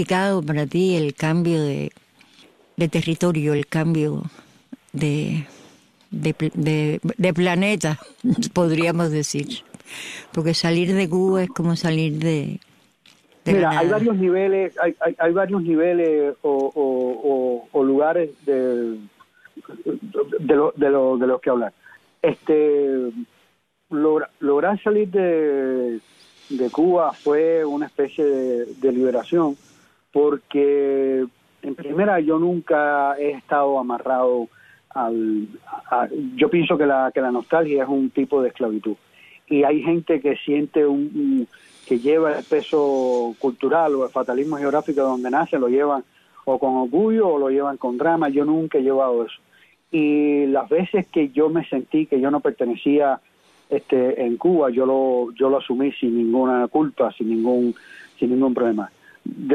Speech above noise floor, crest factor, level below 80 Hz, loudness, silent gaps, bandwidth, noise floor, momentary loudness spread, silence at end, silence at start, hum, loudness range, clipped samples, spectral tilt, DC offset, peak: 44 dB; 16 dB; -62 dBFS; -20 LUFS; none; 13.5 kHz; -64 dBFS; 9 LU; 0 s; 0 s; none; 3 LU; under 0.1%; -6.5 dB/octave; under 0.1%; -6 dBFS